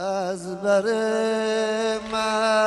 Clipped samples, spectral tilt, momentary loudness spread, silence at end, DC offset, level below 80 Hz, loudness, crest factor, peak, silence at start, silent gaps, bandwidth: under 0.1%; -3.5 dB/octave; 6 LU; 0 s; under 0.1%; -60 dBFS; -23 LUFS; 14 dB; -10 dBFS; 0 s; none; 11.5 kHz